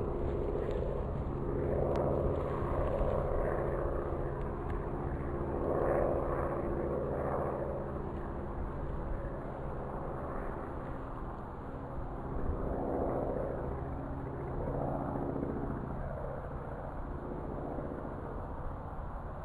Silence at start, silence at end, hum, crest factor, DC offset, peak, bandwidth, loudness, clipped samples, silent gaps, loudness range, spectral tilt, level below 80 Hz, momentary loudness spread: 0 s; 0 s; none; 16 dB; under 0.1%; -20 dBFS; 10.5 kHz; -37 LUFS; under 0.1%; none; 7 LU; -10 dB/octave; -42 dBFS; 9 LU